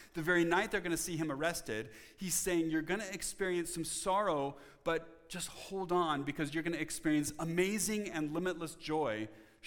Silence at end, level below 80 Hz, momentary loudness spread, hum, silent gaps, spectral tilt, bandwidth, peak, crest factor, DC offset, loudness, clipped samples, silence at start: 0 s; -60 dBFS; 10 LU; none; none; -4 dB/octave; 19 kHz; -16 dBFS; 20 dB; under 0.1%; -36 LUFS; under 0.1%; 0 s